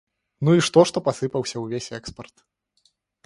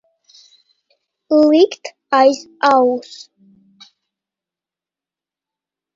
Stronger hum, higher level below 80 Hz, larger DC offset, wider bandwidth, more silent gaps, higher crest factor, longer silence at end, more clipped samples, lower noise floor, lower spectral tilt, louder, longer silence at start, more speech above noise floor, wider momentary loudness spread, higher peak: neither; first, -58 dBFS vs -70 dBFS; neither; first, 11.5 kHz vs 7.8 kHz; neither; about the same, 22 dB vs 18 dB; second, 1.05 s vs 2.95 s; neither; second, -67 dBFS vs -89 dBFS; first, -5.5 dB/octave vs -3.5 dB/octave; second, -21 LUFS vs -14 LUFS; second, 0.4 s vs 1.3 s; second, 45 dB vs 75 dB; about the same, 19 LU vs 19 LU; about the same, -2 dBFS vs 0 dBFS